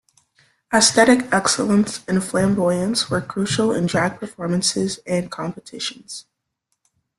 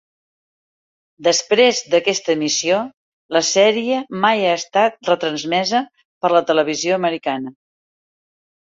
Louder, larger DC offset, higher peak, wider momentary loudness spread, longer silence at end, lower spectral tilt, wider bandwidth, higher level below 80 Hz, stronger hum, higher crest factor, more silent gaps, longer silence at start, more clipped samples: about the same, -19 LUFS vs -17 LUFS; neither; about the same, -2 dBFS vs -2 dBFS; first, 14 LU vs 8 LU; second, 0.95 s vs 1.15 s; first, -4 dB/octave vs -2.5 dB/octave; first, 12.5 kHz vs 7.8 kHz; first, -56 dBFS vs -66 dBFS; neither; about the same, 20 dB vs 18 dB; second, none vs 2.97-3.29 s, 6.05-6.21 s; second, 0.7 s vs 1.2 s; neither